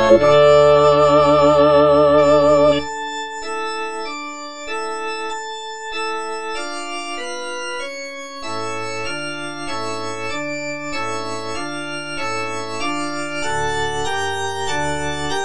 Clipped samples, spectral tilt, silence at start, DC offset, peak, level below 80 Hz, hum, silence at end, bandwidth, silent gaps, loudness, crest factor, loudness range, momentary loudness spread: under 0.1%; -4.5 dB/octave; 0 s; 2%; 0 dBFS; -44 dBFS; none; 0 s; 10.5 kHz; none; -19 LUFS; 18 dB; 12 LU; 14 LU